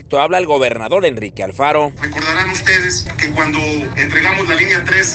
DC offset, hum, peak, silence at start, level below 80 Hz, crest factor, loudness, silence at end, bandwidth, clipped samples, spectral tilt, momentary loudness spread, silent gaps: under 0.1%; none; 0 dBFS; 0 s; -38 dBFS; 14 dB; -13 LUFS; 0 s; 9.2 kHz; under 0.1%; -3.5 dB/octave; 6 LU; none